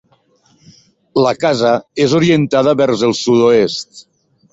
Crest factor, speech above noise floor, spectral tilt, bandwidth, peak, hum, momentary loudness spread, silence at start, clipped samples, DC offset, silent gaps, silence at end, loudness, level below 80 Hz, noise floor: 14 dB; 42 dB; -5.5 dB/octave; 8 kHz; -2 dBFS; none; 7 LU; 1.15 s; under 0.1%; under 0.1%; none; 0.5 s; -13 LUFS; -54 dBFS; -55 dBFS